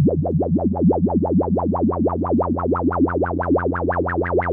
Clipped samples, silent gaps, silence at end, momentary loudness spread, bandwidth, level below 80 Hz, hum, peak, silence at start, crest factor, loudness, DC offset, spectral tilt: under 0.1%; none; 0 s; 3 LU; 3.2 kHz; -46 dBFS; none; -6 dBFS; 0 s; 12 dB; -20 LUFS; under 0.1%; -13.5 dB/octave